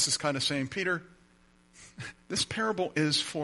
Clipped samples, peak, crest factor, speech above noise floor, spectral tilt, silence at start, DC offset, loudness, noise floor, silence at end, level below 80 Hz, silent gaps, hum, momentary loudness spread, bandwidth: under 0.1%; -14 dBFS; 18 dB; 32 dB; -3 dB/octave; 0 s; under 0.1%; -30 LUFS; -62 dBFS; 0 s; -64 dBFS; none; none; 14 LU; 11.5 kHz